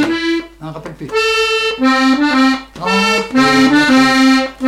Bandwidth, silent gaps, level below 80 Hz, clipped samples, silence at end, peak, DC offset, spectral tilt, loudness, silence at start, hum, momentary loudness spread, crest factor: 14 kHz; none; -44 dBFS; under 0.1%; 0 s; -2 dBFS; under 0.1%; -3.5 dB/octave; -12 LUFS; 0 s; none; 11 LU; 10 dB